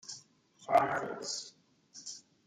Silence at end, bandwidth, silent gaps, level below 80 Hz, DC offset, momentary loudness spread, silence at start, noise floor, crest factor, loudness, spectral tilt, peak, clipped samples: 0.25 s; 13.5 kHz; none; -76 dBFS; under 0.1%; 22 LU; 0.05 s; -62 dBFS; 24 dB; -33 LUFS; -2.5 dB/octave; -12 dBFS; under 0.1%